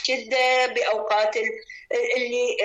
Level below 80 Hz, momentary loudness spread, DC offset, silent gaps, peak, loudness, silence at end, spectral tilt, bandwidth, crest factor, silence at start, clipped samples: -68 dBFS; 9 LU; under 0.1%; none; -12 dBFS; -23 LUFS; 0 s; 0 dB/octave; 8.8 kHz; 12 dB; 0 s; under 0.1%